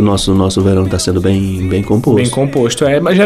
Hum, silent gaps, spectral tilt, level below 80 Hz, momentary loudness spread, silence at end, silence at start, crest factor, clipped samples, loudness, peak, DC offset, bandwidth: none; none; -6 dB/octave; -32 dBFS; 3 LU; 0 s; 0 s; 10 dB; under 0.1%; -12 LUFS; -2 dBFS; under 0.1%; 14.5 kHz